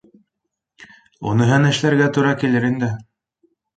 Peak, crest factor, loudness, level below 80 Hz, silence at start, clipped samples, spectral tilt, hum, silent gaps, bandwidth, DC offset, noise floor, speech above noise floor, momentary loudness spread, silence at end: -2 dBFS; 18 dB; -17 LUFS; -56 dBFS; 0.8 s; under 0.1%; -6.5 dB/octave; none; none; 9 kHz; under 0.1%; -79 dBFS; 62 dB; 10 LU; 0.75 s